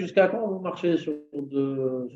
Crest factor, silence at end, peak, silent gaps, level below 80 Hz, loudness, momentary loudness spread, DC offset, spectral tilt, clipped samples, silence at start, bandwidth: 18 dB; 0 s; -8 dBFS; none; -76 dBFS; -27 LUFS; 9 LU; under 0.1%; -7.5 dB/octave; under 0.1%; 0 s; 7.6 kHz